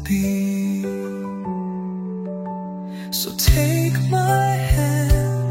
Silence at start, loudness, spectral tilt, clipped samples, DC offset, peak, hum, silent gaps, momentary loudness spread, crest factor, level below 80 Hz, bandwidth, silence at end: 0 s; -21 LUFS; -5.5 dB/octave; under 0.1%; under 0.1%; -4 dBFS; none; none; 11 LU; 18 dB; -28 dBFS; 16.5 kHz; 0 s